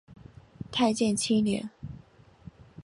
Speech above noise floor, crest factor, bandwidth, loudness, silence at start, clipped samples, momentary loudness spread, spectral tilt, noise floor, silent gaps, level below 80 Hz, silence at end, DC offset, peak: 29 dB; 18 dB; 11.5 kHz; -27 LUFS; 0.1 s; under 0.1%; 22 LU; -4.5 dB/octave; -55 dBFS; none; -58 dBFS; 0 s; under 0.1%; -12 dBFS